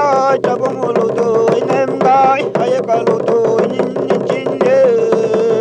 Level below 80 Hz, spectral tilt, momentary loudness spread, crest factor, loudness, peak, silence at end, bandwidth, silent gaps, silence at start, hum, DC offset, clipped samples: -60 dBFS; -6.5 dB/octave; 5 LU; 12 dB; -13 LUFS; -2 dBFS; 0 s; 8.8 kHz; none; 0 s; none; under 0.1%; under 0.1%